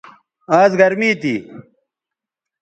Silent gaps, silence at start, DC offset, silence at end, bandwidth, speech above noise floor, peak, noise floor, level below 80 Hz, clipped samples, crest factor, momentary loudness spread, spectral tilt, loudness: none; 0.5 s; under 0.1%; 1 s; 8.8 kHz; 71 dB; 0 dBFS; -85 dBFS; -64 dBFS; under 0.1%; 18 dB; 10 LU; -6 dB/octave; -15 LUFS